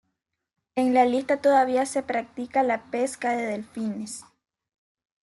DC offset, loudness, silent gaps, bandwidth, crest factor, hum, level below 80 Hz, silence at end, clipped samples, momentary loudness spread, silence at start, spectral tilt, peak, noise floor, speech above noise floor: under 0.1%; -25 LUFS; none; 12 kHz; 18 dB; none; -72 dBFS; 1 s; under 0.1%; 12 LU; 0.75 s; -4.5 dB/octave; -8 dBFS; -79 dBFS; 55 dB